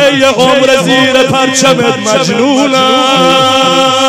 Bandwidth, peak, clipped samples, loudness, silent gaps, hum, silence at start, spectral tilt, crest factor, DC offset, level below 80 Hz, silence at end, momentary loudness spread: 17 kHz; 0 dBFS; 2%; -7 LUFS; none; none; 0 s; -3.5 dB/octave; 8 dB; 0.4%; -48 dBFS; 0 s; 3 LU